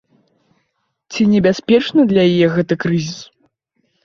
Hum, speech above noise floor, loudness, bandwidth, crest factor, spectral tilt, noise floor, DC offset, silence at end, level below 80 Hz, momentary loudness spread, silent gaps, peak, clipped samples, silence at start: none; 56 dB; -14 LUFS; 7.4 kHz; 14 dB; -6.5 dB/octave; -69 dBFS; under 0.1%; 0.8 s; -54 dBFS; 13 LU; none; -2 dBFS; under 0.1%; 1.1 s